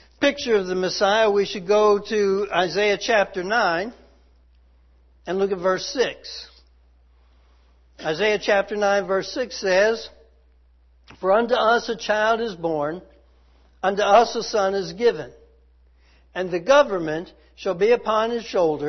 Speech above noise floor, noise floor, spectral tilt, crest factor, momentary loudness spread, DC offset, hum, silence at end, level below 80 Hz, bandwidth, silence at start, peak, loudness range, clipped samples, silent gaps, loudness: 35 dB; -56 dBFS; -4 dB/octave; 20 dB; 13 LU; under 0.1%; none; 0 s; -54 dBFS; 6.4 kHz; 0.2 s; -4 dBFS; 6 LU; under 0.1%; none; -21 LUFS